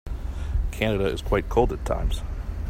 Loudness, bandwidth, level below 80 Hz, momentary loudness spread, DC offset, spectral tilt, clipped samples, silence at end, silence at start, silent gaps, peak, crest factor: -26 LUFS; 16 kHz; -28 dBFS; 9 LU; under 0.1%; -6.5 dB/octave; under 0.1%; 0 s; 0.05 s; none; -6 dBFS; 20 dB